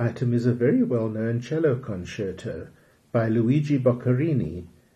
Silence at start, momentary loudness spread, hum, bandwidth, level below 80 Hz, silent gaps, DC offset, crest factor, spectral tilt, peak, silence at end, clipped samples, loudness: 0 s; 12 LU; none; 8.4 kHz; -56 dBFS; none; under 0.1%; 16 dB; -9 dB/octave; -8 dBFS; 0.25 s; under 0.1%; -24 LUFS